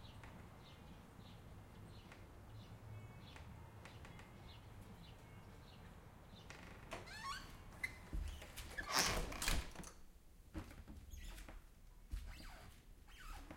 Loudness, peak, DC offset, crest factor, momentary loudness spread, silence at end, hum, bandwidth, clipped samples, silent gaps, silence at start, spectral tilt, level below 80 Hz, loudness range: -49 LUFS; -18 dBFS; under 0.1%; 32 dB; 18 LU; 0 s; none; 16.5 kHz; under 0.1%; none; 0 s; -2.5 dB/octave; -56 dBFS; 15 LU